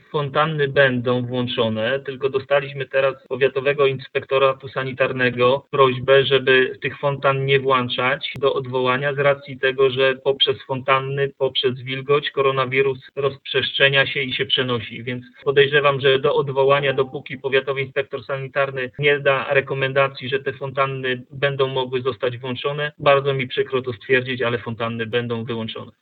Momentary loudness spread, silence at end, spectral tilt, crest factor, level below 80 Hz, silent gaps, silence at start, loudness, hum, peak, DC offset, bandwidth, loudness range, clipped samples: 9 LU; 0.1 s; -8.5 dB/octave; 20 dB; -62 dBFS; none; 0.15 s; -20 LUFS; none; 0 dBFS; under 0.1%; 4.7 kHz; 3 LU; under 0.1%